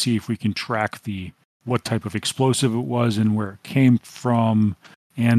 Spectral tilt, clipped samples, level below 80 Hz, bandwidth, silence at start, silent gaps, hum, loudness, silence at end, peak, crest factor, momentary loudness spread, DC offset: -6 dB/octave; under 0.1%; -60 dBFS; 14 kHz; 0 s; 1.45-1.60 s, 4.96-5.10 s; none; -22 LUFS; 0 s; -4 dBFS; 16 dB; 13 LU; under 0.1%